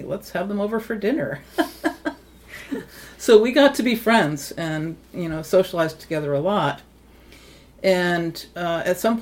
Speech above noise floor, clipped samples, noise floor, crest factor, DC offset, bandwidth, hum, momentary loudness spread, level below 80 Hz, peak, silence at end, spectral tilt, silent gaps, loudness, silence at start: 27 dB; under 0.1%; -48 dBFS; 20 dB; under 0.1%; 17 kHz; none; 15 LU; -52 dBFS; -2 dBFS; 0 s; -5 dB/octave; none; -22 LUFS; 0 s